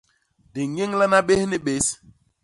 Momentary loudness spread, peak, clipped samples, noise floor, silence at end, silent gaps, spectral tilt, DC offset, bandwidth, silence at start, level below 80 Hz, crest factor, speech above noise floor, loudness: 14 LU; -4 dBFS; under 0.1%; -61 dBFS; 0.5 s; none; -4 dB/octave; under 0.1%; 11.5 kHz; 0.55 s; -54 dBFS; 18 dB; 40 dB; -21 LUFS